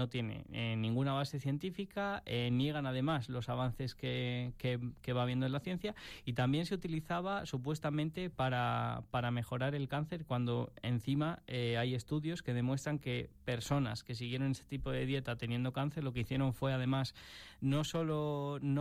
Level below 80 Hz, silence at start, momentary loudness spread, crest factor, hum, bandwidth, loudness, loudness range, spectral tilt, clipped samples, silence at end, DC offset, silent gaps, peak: -58 dBFS; 0 s; 6 LU; 16 dB; none; 15 kHz; -37 LUFS; 1 LU; -6.5 dB/octave; under 0.1%; 0 s; under 0.1%; none; -20 dBFS